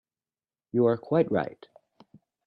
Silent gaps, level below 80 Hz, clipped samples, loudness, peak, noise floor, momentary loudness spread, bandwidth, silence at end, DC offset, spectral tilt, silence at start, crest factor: none; -70 dBFS; under 0.1%; -27 LUFS; -10 dBFS; under -90 dBFS; 7 LU; 5.4 kHz; 0.95 s; under 0.1%; -10.5 dB/octave; 0.75 s; 18 dB